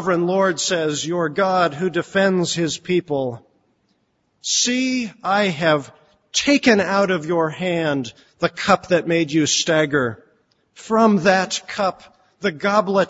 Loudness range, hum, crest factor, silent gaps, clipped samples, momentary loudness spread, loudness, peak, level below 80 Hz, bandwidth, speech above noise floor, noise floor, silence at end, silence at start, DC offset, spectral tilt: 3 LU; none; 18 dB; none; under 0.1%; 8 LU; -19 LUFS; 0 dBFS; -60 dBFS; 8 kHz; 48 dB; -67 dBFS; 0 s; 0 s; under 0.1%; -4 dB/octave